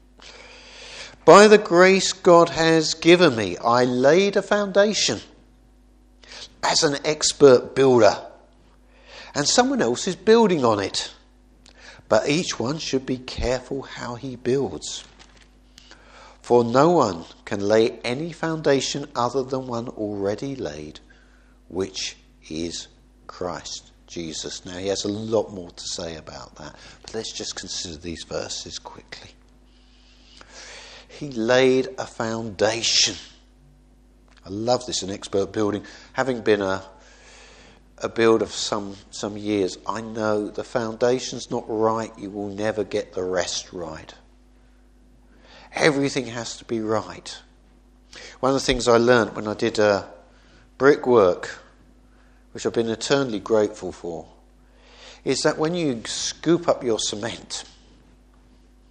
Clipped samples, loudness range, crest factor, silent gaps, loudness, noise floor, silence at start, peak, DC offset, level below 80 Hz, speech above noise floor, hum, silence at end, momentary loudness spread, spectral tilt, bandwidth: under 0.1%; 11 LU; 22 dB; none; -21 LUFS; -53 dBFS; 0.2 s; 0 dBFS; under 0.1%; -50 dBFS; 32 dB; none; 1.3 s; 19 LU; -4 dB/octave; 10.5 kHz